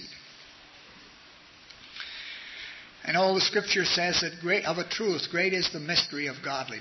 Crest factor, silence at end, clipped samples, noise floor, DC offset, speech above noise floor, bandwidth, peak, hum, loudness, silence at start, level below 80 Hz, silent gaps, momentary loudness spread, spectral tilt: 18 dB; 0 s; under 0.1%; -53 dBFS; under 0.1%; 25 dB; 6.2 kHz; -12 dBFS; none; -27 LUFS; 0 s; -64 dBFS; none; 20 LU; -3 dB/octave